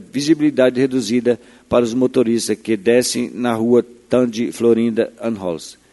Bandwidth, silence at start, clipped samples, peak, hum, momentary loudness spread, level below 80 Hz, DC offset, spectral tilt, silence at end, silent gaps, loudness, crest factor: 12 kHz; 0 s; under 0.1%; 0 dBFS; none; 7 LU; -54 dBFS; under 0.1%; -5 dB/octave; 0.2 s; none; -17 LUFS; 16 dB